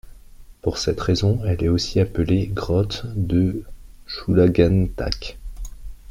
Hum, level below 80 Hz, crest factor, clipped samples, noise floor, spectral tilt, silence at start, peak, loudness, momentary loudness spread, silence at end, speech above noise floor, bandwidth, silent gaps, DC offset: none; -34 dBFS; 18 dB; under 0.1%; -43 dBFS; -7 dB/octave; 0.05 s; -4 dBFS; -21 LUFS; 16 LU; 0 s; 23 dB; 11.5 kHz; none; under 0.1%